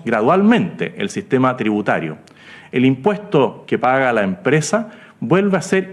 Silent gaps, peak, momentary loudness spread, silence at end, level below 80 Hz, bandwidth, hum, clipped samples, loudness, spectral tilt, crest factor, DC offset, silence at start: none; -2 dBFS; 9 LU; 0 s; -60 dBFS; 12 kHz; none; under 0.1%; -17 LUFS; -6 dB/octave; 14 dB; under 0.1%; 0.05 s